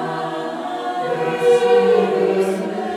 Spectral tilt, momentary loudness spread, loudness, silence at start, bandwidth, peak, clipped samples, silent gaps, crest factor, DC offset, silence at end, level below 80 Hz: -5.5 dB/octave; 11 LU; -18 LUFS; 0 s; 12.5 kHz; -4 dBFS; under 0.1%; none; 14 dB; under 0.1%; 0 s; -70 dBFS